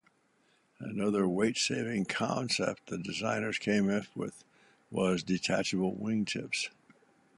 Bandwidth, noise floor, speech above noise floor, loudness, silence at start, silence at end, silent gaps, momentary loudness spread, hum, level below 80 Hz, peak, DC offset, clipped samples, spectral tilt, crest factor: 11.5 kHz; -70 dBFS; 38 dB; -32 LUFS; 0.8 s; 0.7 s; none; 10 LU; none; -68 dBFS; -16 dBFS; under 0.1%; under 0.1%; -4.5 dB/octave; 18 dB